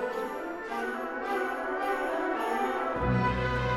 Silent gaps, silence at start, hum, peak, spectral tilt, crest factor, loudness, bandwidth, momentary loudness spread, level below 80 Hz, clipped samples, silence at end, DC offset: none; 0 s; none; -16 dBFS; -6.5 dB/octave; 14 dB; -31 LUFS; 16.5 kHz; 7 LU; -46 dBFS; under 0.1%; 0 s; under 0.1%